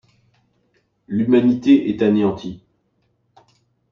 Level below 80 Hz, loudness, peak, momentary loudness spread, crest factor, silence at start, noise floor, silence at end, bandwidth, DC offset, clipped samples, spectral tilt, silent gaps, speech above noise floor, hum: -58 dBFS; -17 LUFS; -2 dBFS; 13 LU; 18 dB; 1.1 s; -66 dBFS; 1.35 s; 6.8 kHz; under 0.1%; under 0.1%; -8 dB/octave; none; 50 dB; none